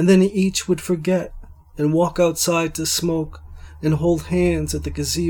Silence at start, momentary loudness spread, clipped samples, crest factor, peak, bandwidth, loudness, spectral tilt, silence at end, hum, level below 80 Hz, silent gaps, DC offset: 0 s; 8 LU; under 0.1%; 16 dB; -4 dBFS; 18 kHz; -20 LUFS; -5 dB/octave; 0 s; none; -38 dBFS; none; under 0.1%